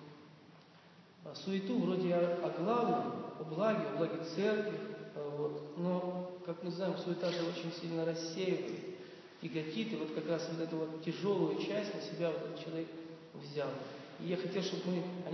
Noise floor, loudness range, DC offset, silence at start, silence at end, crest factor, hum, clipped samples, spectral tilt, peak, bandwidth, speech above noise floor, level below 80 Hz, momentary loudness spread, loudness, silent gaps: -60 dBFS; 4 LU; under 0.1%; 0 s; 0 s; 18 dB; none; under 0.1%; -5.5 dB/octave; -20 dBFS; 6.4 kHz; 23 dB; -90 dBFS; 11 LU; -38 LUFS; none